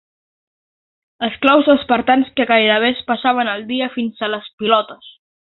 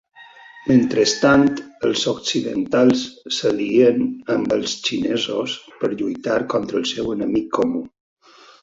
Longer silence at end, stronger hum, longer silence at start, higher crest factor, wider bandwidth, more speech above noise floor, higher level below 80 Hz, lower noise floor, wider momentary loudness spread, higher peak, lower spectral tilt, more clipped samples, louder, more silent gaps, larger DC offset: second, 0.45 s vs 0.75 s; neither; first, 1.2 s vs 0.2 s; about the same, 18 dB vs 18 dB; second, 4.3 kHz vs 7.8 kHz; first, over 74 dB vs 25 dB; about the same, -58 dBFS vs -54 dBFS; first, under -90 dBFS vs -44 dBFS; about the same, 10 LU vs 9 LU; about the same, 0 dBFS vs -2 dBFS; first, -7 dB/octave vs -4.5 dB/octave; neither; first, -16 LUFS vs -20 LUFS; first, 4.53-4.58 s vs none; neither